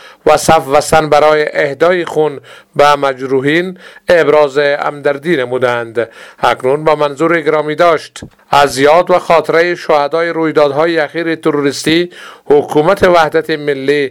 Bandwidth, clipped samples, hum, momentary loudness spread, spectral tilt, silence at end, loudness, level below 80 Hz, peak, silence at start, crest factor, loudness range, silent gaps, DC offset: 17 kHz; 0.5%; none; 7 LU; -4.5 dB/octave; 0 s; -11 LUFS; -44 dBFS; 0 dBFS; 0.05 s; 12 dB; 2 LU; none; under 0.1%